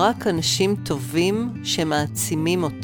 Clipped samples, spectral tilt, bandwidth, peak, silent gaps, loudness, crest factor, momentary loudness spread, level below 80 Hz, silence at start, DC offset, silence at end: under 0.1%; -4 dB/octave; over 20 kHz; -4 dBFS; none; -22 LUFS; 18 dB; 4 LU; -52 dBFS; 0 s; under 0.1%; 0 s